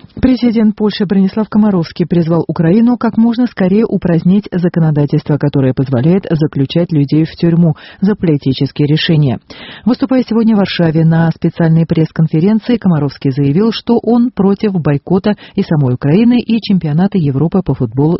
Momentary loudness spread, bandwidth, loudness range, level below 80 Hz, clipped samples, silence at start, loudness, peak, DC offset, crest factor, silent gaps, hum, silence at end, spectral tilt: 4 LU; 5.8 kHz; 1 LU; -40 dBFS; under 0.1%; 0.15 s; -12 LUFS; 0 dBFS; under 0.1%; 12 dB; none; none; 0 s; -7.5 dB/octave